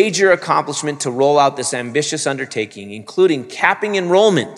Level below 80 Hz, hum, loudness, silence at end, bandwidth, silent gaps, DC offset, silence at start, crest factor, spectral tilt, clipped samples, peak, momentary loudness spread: -68 dBFS; none; -16 LUFS; 0 s; 12 kHz; none; under 0.1%; 0 s; 16 dB; -3.5 dB/octave; under 0.1%; 0 dBFS; 10 LU